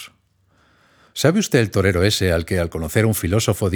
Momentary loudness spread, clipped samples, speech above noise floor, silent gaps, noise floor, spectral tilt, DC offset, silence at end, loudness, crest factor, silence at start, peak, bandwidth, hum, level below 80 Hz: 5 LU; under 0.1%; 42 dB; none; -60 dBFS; -5 dB/octave; under 0.1%; 0 s; -19 LUFS; 18 dB; 0 s; -2 dBFS; over 20 kHz; none; -40 dBFS